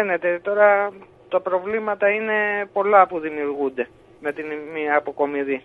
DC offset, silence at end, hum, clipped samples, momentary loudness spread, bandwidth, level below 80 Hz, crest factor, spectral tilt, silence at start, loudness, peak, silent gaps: under 0.1%; 0.05 s; none; under 0.1%; 13 LU; 4 kHz; -66 dBFS; 20 dB; -7 dB/octave; 0 s; -21 LUFS; -2 dBFS; none